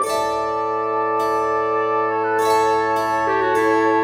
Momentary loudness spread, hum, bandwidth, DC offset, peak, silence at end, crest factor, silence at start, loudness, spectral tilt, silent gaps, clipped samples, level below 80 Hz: 4 LU; none; 17.5 kHz; under 0.1%; -6 dBFS; 0 s; 12 dB; 0 s; -19 LUFS; -4 dB/octave; none; under 0.1%; -56 dBFS